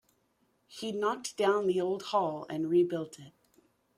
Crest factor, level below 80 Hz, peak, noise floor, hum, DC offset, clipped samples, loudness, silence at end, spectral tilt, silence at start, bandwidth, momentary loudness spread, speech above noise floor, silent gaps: 18 dB; -78 dBFS; -16 dBFS; -73 dBFS; none; under 0.1%; under 0.1%; -31 LUFS; 0.7 s; -5 dB/octave; 0.7 s; 13 kHz; 14 LU; 43 dB; none